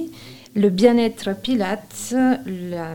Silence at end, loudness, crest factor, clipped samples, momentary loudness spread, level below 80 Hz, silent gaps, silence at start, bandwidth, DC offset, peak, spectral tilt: 0 s; -20 LUFS; 20 dB; under 0.1%; 13 LU; -56 dBFS; none; 0 s; 17.5 kHz; 0.4%; -2 dBFS; -5.5 dB/octave